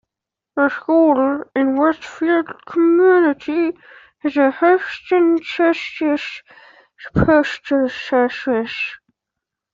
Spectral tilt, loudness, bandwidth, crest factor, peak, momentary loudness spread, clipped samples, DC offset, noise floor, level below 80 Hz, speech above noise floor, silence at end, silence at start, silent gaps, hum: -7 dB/octave; -17 LUFS; 7.4 kHz; 14 dB; -2 dBFS; 10 LU; under 0.1%; under 0.1%; -85 dBFS; -46 dBFS; 68 dB; 0.8 s; 0.55 s; none; none